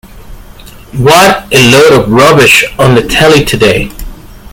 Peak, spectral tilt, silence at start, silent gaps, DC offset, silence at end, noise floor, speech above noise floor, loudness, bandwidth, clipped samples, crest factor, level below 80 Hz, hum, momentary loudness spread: 0 dBFS; -4 dB/octave; 0.15 s; none; under 0.1%; 0.05 s; -30 dBFS; 25 dB; -5 LUFS; over 20 kHz; 5%; 6 dB; -26 dBFS; none; 8 LU